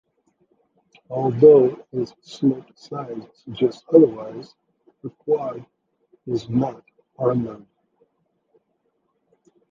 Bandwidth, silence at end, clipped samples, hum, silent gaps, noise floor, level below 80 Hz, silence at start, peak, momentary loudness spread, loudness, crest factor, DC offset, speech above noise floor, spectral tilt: 7.4 kHz; 2.15 s; under 0.1%; none; none; -71 dBFS; -62 dBFS; 1.1 s; -2 dBFS; 22 LU; -20 LUFS; 20 dB; under 0.1%; 51 dB; -9 dB/octave